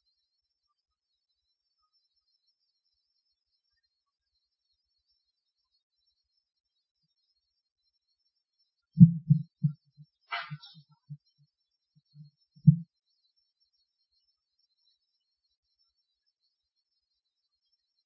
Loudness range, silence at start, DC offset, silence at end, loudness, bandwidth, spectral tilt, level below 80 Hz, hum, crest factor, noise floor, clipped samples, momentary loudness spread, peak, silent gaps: 6 LU; 8.95 s; under 0.1%; 5.25 s; -25 LUFS; 5.6 kHz; -8.5 dB/octave; -64 dBFS; none; 30 dB; -84 dBFS; under 0.1%; 22 LU; -4 dBFS; none